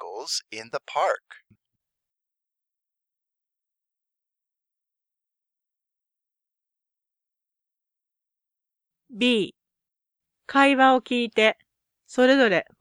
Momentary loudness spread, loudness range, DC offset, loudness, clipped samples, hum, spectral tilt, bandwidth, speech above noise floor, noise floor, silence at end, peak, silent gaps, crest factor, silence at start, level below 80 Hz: 15 LU; 12 LU; under 0.1%; -22 LUFS; under 0.1%; none; -3.5 dB/octave; 12 kHz; 66 dB; -88 dBFS; 0.15 s; -4 dBFS; none; 22 dB; 0 s; -76 dBFS